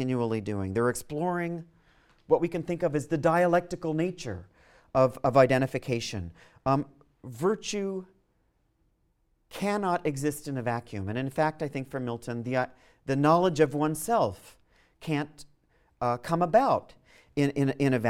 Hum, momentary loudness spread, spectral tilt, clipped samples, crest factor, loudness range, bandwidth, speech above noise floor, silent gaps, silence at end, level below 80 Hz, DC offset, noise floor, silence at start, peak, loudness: none; 13 LU; -6.5 dB/octave; under 0.1%; 22 dB; 6 LU; 16.5 kHz; 43 dB; none; 0 s; -58 dBFS; under 0.1%; -71 dBFS; 0 s; -6 dBFS; -28 LUFS